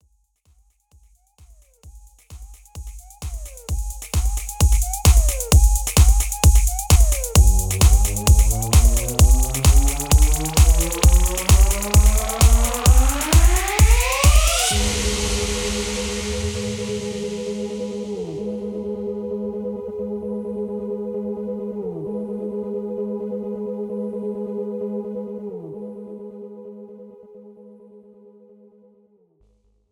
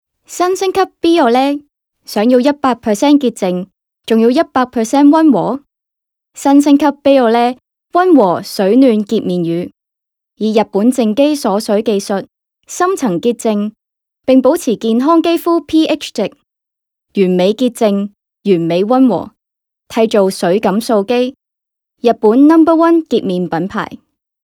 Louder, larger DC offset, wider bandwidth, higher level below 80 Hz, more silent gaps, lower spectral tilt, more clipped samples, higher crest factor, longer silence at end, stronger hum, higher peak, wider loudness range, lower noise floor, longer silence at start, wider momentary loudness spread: second, -20 LUFS vs -12 LUFS; neither; first, 19.5 kHz vs 17.5 kHz; first, -20 dBFS vs -56 dBFS; neither; about the same, -4.5 dB/octave vs -5.5 dB/octave; neither; first, 18 dB vs 12 dB; first, 2.4 s vs 0.5 s; neither; about the same, 0 dBFS vs 0 dBFS; first, 14 LU vs 4 LU; second, -61 dBFS vs -81 dBFS; first, 1.85 s vs 0.3 s; first, 16 LU vs 12 LU